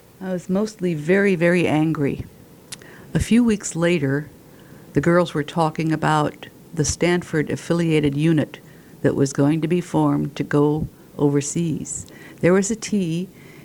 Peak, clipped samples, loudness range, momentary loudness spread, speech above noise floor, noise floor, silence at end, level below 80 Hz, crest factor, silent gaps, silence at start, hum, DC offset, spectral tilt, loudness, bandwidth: -4 dBFS; under 0.1%; 1 LU; 13 LU; 25 dB; -44 dBFS; 0.05 s; -46 dBFS; 18 dB; none; 0.2 s; none; under 0.1%; -6 dB/octave; -21 LUFS; 18.5 kHz